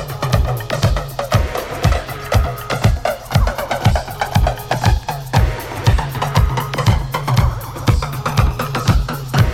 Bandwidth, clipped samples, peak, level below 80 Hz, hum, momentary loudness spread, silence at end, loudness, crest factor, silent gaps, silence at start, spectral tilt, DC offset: 17 kHz; under 0.1%; 0 dBFS; -22 dBFS; none; 4 LU; 0 s; -18 LUFS; 16 dB; none; 0 s; -5.5 dB/octave; under 0.1%